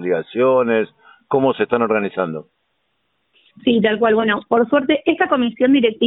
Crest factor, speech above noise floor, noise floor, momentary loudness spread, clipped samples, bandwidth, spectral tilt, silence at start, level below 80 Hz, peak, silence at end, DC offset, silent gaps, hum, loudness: 16 dB; 53 dB; -69 dBFS; 8 LU; under 0.1%; 4 kHz; -10.5 dB/octave; 0 s; -58 dBFS; -2 dBFS; 0 s; under 0.1%; none; none; -17 LUFS